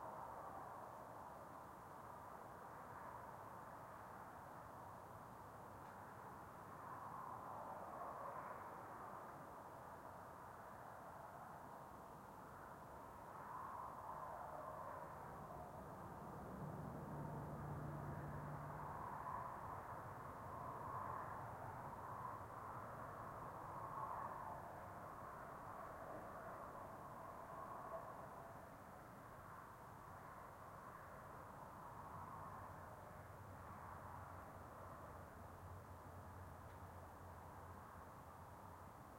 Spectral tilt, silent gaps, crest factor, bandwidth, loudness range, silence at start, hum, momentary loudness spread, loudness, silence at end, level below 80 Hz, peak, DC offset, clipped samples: -6.5 dB/octave; none; 18 dB; 16.5 kHz; 6 LU; 0 s; none; 7 LU; -54 LUFS; 0 s; -72 dBFS; -36 dBFS; under 0.1%; under 0.1%